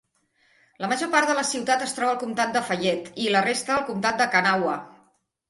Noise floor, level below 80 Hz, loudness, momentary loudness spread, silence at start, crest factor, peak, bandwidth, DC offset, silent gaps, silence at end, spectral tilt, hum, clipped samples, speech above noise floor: -66 dBFS; -66 dBFS; -23 LUFS; 7 LU; 0.8 s; 20 dB; -4 dBFS; 11.5 kHz; under 0.1%; none; 0.6 s; -3 dB/octave; none; under 0.1%; 42 dB